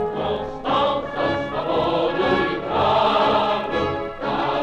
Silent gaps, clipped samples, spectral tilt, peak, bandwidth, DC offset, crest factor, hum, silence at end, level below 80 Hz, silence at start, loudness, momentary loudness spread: none; under 0.1%; -6.5 dB/octave; -8 dBFS; 9.2 kHz; under 0.1%; 12 dB; none; 0 s; -44 dBFS; 0 s; -21 LUFS; 8 LU